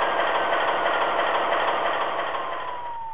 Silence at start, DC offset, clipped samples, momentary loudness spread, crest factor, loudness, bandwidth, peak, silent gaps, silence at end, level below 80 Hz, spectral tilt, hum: 0 s; 1%; under 0.1%; 8 LU; 14 dB; -24 LUFS; 4 kHz; -10 dBFS; none; 0 s; -62 dBFS; -6.5 dB/octave; none